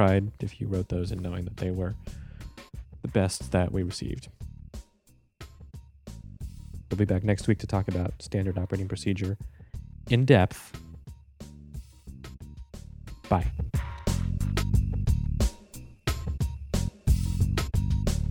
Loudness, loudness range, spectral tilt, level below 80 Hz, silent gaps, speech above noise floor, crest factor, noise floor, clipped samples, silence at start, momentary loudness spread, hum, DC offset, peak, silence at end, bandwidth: -29 LUFS; 7 LU; -6.5 dB/octave; -36 dBFS; none; 36 dB; 24 dB; -62 dBFS; under 0.1%; 0 s; 20 LU; none; under 0.1%; -4 dBFS; 0 s; 17 kHz